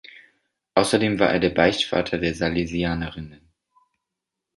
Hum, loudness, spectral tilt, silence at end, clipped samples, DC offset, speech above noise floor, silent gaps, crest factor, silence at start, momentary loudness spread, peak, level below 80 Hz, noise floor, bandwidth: none; -22 LUFS; -5 dB/octave; 1.25 s; under 0.1%; under 0.1%; 62 dB; none; 22 dB; 0.15 s; 11 LU; -2 dBFS; -46 dBFS; -84 dBFS; 11.5 kHz